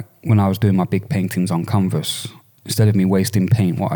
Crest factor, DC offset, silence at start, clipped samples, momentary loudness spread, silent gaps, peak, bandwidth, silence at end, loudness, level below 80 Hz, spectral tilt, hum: 14 dB; under 0.1%; 0 s; under 0.1%; 8 LU; none; -4 dBFS; 19.5 kHz; 0 s; -18 LUFS; -54 dBFS; -6.5 dB/octave; none